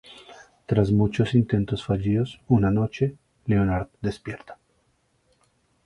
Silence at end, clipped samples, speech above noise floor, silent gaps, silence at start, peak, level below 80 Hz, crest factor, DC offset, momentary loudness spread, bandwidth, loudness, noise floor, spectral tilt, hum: 1.35 s; under 0.1%; 45 dB; none; 0.1 s; -6 dBFS; -44 dBFS; 20 dB; under 0.1%; 16 LU; 10.5 kHz; -24 LUFS; -67 dBFS; -8.5 dB/octave; none